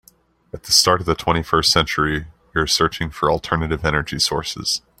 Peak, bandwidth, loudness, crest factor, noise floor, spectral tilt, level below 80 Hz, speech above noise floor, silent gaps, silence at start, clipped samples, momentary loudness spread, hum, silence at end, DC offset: 0 dBFS; 16 kHz; -18 LUFS; 20 dB; -55 dBFS; -3 dB/octave; -38 dBFS; 36 dB; none; 0.55 s; under 0.1%; 9 LU; none; 0.2 s; under 0.1%